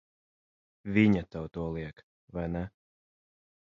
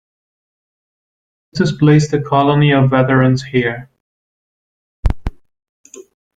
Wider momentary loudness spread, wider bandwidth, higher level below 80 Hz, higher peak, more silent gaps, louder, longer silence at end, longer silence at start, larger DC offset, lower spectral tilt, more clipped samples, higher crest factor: first, 18 LU vs 14 LU; second, 7 kHz vs 7.8 kHz; second, -52 dBFS vs -32 dBFS; second, -10 dBFS vs -2 dBFS; second, 2.03-2.28 s vs 4.00-5.03 s, 5.69-5.84 s; second, -31 LUFS vs -14 LUFS; first, 0.95 s vs 0.35 s; second, 0.85 s vs 1.55 s; neither; first, -9 dB/octave vs -7 dB/octave; neither; first, 24 dB vs 16 dB